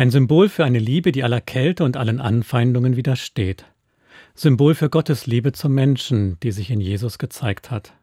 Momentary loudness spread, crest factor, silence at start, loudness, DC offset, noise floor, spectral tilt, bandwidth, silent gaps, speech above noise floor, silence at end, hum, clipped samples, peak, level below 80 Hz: 10 LU; 16 dB; 0 s; -19 LUFS; under 0.1%; -50 dBFS; -7.5 dB/octave; 15.5 kHz; none; 32 dB; 0.2 s; none; under 0.1%; -2 dBFS; -52 dBFS